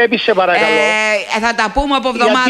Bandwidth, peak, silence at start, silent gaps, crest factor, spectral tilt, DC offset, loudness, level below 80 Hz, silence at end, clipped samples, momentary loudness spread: 12.5 kHz; 0 dBFS; 0 s; none; 12 dB; -3 dB/octave; under 0.1%; -13 LUFS; -34 dBFS; 0 s; under 0.1%; 4 LU